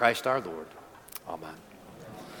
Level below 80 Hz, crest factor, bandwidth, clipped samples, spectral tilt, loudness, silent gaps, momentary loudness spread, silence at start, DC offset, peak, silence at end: -68 dBFS; 26 dB; 19 kHz; under 0.1%; -4 dB/octave; -33 LUFS; none; 20 LU; 0 s; under 0.1%; -6 dBFS; 0 s